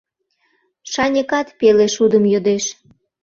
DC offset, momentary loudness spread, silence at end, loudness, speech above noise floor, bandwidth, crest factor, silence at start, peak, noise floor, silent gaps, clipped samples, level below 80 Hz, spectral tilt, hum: under 0.1%; 8 LU; 0.5 s; -16 LUFS; 50 dB; 7.6 kHz; 16 dB; 0.85 s; -2 dBFS; -66 dBFS; none; under 0.1%; -56 dBFS; -4 dB/octave; none